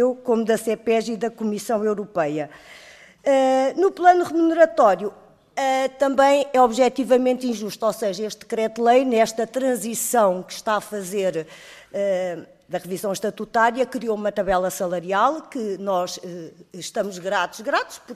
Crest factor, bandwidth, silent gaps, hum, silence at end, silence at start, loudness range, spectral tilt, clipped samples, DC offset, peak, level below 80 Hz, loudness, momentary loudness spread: 18 dB; 15 kHz; none; none; 0 s; 0 s; 6 LU; -4 dB/octave; under 0.1%; under 0.1%; -4 dBFS; -58 dBFS; -21 LUFS; 13 LU